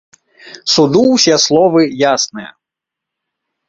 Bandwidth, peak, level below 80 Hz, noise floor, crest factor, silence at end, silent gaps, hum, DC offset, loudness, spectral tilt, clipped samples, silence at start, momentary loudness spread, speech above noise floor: 8 kHz; 0 dBFS; -56 dBFS; -82 dBFS; 14 dB; 1.2 s; none; none; under 0.1%; -11 LUFS; -3.5 dB/octave; under 0.1%; 0.45 s; 10 LU; 71 dB